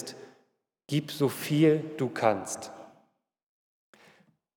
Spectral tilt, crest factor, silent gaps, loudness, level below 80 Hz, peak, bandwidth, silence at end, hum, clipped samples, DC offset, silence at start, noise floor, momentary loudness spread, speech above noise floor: -5.5 dB/octave; 22 dB; none; -28 LUFS; -84 dBFS; -10 dBFS; 20 kHz; 1.7 s; none; under 0.1%; under 0.1%; 0 s; -72 dBFS; 20 LU; 45 dB